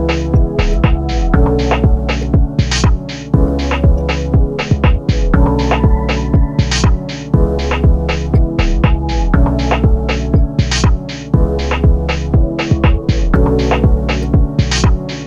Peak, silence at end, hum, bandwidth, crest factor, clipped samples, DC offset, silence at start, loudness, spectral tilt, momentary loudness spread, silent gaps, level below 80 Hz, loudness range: 0 dBFS; 0 s; none; 8.2 kHz; 12 dB; under 0.1%; under 0.1%; 0 s; -14 LUFS; -6.5 dB/octave; 3 LU; none; -14 dBFS; 1 LU